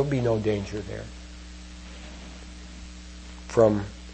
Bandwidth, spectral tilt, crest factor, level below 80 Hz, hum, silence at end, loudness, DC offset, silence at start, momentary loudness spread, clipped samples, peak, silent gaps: 8.8 kHz; -7 dB/octave; 22 dB; -44 dBFS; none; 0 s; -26 LUFS; under 0.1%; 0 s; 21 LU; under 0.1%; -6 dBFS; none